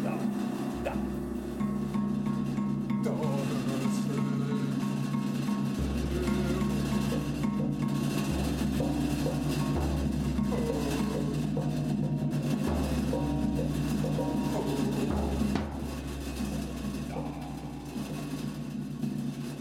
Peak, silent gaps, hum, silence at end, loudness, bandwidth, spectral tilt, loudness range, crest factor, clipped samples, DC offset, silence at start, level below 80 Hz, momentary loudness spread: -14 dBFS; none; none; 0 s; -31 LUFS; 16.5 kHz; -6.5 dB/octave; 4 LU; 16 dB; under 0.1%; under 0.1%; 0 s; -42 dBFS; 6 LU